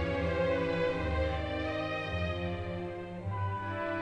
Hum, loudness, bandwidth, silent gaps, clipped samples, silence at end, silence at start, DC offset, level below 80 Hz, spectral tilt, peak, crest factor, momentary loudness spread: none; -34 LUFS; 9.6 kHz; none; under 0.1%; 0 s; 0 s; under 0.1%; -44 dBFS; -7.5 dB/octave; -18 dBFS; 14 dB; 8 LU